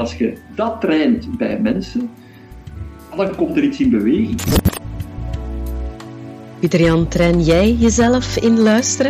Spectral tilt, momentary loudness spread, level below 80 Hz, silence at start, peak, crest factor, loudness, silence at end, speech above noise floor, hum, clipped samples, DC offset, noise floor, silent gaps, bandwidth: -5.5 dB/octave; 17 LU; -30 dBFS; 0 s; -2 dBFS; 16 dB; -16 LUFS; 0 s; 21 dB; none; under 0.1%; under 0.1%; -36 dBFS; none; 15.5 kHz